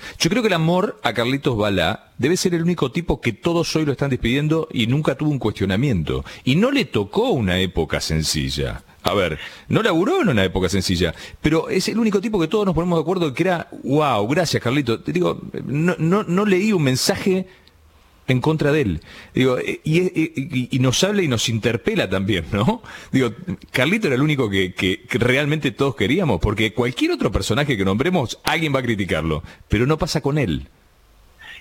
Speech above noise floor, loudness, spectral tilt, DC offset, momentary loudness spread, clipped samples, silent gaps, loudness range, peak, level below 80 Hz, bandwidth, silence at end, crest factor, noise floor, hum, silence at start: 33 dB; -20 LUFS; -5.5 dB/octave; under 0.1%; 6 LU; under 0.1%; none; 1 LU; 0 dBFS; -40 dBFS; 17 kHz; 0 s; 20 dB; -52 dBFS; none; 0 s